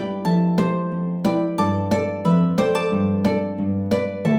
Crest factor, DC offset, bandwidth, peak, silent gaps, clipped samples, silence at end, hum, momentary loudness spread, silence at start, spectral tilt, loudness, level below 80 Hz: 14 dB; under 0.1%; 11.5 kHz; -6 dBFS; none; under 0.1%; 0 s; none; 4 LU; 0 s; -8 dB/octave; -21 LUFS; -54 dBFS